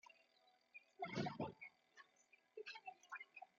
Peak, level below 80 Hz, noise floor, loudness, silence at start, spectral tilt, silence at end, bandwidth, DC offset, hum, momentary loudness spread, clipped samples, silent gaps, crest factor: -32 dBFS; -86 dBFS; -77 dBFS; -51 LUFS; 0.05 s; -4 dB/octave; 0.15 s; 7.2 kHz; under 0.1%; none; 21 LU; under 0.1%; none; 22 dB